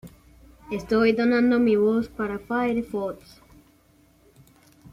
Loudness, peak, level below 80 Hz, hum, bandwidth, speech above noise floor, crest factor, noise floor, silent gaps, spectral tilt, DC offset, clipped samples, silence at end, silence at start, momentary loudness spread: -23 LUFS; -8 dBFS; -54 dBFS; none; 12.5 kHz; 36 dB; 16 dB; -59 dBFS; none; -7 dB/octave; under 0.1%; under 0.1%; 1.8 s; 0.05 s; 14 LU